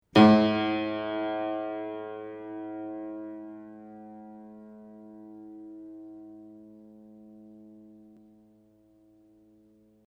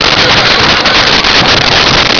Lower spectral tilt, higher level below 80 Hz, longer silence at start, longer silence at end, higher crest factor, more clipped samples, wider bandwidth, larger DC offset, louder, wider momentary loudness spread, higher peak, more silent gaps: first, -7.5 dB/octave vs -2.5 dB/octave; second, -68 dBFS vs -26 dBFS; first, 0.15 s vs 0 s; first, 2.4 s vs 0 s; first, 26 dB vs 6 dB; neither; first, 7.8 kHz vs 5.4 kHz; neither; second, -27 LUFS vs -4 LUFS; first, 26 LU vs 0 LU; second, -4 dBFS vs 0 dBFS; neither